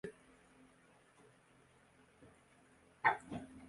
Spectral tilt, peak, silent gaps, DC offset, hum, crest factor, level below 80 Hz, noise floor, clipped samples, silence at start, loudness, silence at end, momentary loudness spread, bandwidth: -5 dB/octave; -18 dBFS; none; under 0.1%; none; 28 dB; -74 dBFS; -68 dBFS; under 0.1%; 0.05 s; -38 LUFS; 0 s; 29 LU; 11.5 kHz